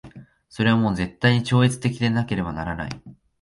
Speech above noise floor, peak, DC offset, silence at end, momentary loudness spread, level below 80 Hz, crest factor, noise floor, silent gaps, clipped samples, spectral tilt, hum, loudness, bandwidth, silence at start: 24 dB; -6 dBFS; under 0.1%; 0.3 s; 11 LU; -46 dBFS; 16 dB; -45 dBFS; none; under 0.1%; -6.5 dB/octave; none; -22 LUFS; 11.5 kHz; 0.05 s